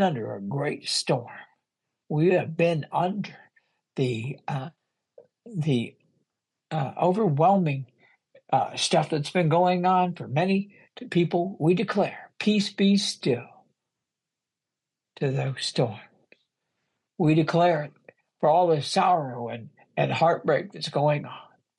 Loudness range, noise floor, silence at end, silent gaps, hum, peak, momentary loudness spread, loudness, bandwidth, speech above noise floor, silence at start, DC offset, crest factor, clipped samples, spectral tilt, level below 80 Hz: 7 LU; -88 dBFS; 0.35 s; none; none; -8 dBFS; 13 LU; -25 LUFS; 11.5 kHz; 63 dB; 0 s; under 0.1%; 18 dB; under 0.1%; -6 dB/octave; -72 dBFS